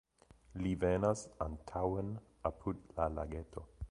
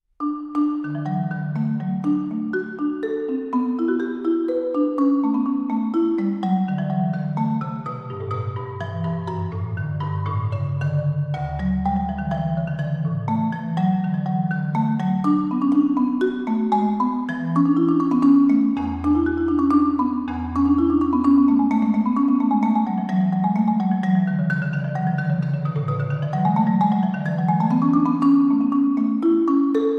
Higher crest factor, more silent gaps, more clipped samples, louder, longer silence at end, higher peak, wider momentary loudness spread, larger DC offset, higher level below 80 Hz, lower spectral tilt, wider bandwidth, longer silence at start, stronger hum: first, 20 dB vs 14 dB; neither; neither; second, -39 LUFS vs -21 LUFS; about the same, 0.05 s vs 0 s; second, -18 dBFS vs -6 dBFS; first, 12 LU vs 8 LU; neither; about the same, -50 dBFS vs -46 dBFS; second, -7 dB/octave vs -10 dB/octave; first, 11 kHz vs 5.4 kHz; first, 0.55 s vs 0.2 s; neither